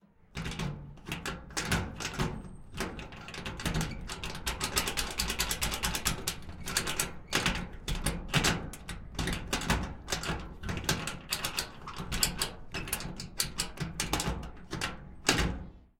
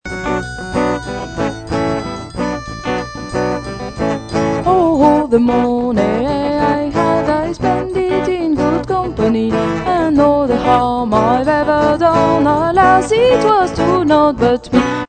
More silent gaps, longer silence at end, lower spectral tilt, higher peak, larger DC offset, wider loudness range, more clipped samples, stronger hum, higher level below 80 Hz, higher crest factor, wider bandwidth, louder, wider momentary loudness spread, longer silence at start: neither; first, 0.15 s vs 0 s; second, -3 dB/octave vs -6.5 dB/octave; second, -6 dBFS vs 0 dBFS; neither; second, 4 LU vs 8 LU; neither; neither; second, -42 dBFS vs -34 dBFS; first, 28 dB vs 14 dB; first, 17 kHz vs 9.2 kHz; second, -33 LUFS vs -14 LUFS; about the same, 11 LU vs 10 LU; first, 0.3 s vs 0.05 s